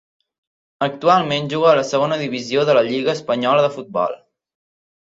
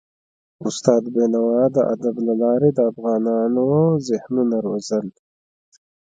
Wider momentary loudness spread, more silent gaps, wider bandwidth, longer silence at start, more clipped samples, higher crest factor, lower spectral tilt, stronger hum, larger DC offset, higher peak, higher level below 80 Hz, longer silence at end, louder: about the same, 8 LU vs 7 LU; neither; second, 7.8 kHz vs 9.2 kHz; first, 0.8 s vs 0.6 s; neither; about the same, 18 dB vs 20 dB; second, -5 dB/octave vs -7.5 dB/octave; neither; neither; about the same, -2 dBFS vs 0 dBFS; about the same, -64 dBFS vs -64 dBFS; second, 0.85 s vs 1 s; about the same, -18 LUFS vs -19 LUFS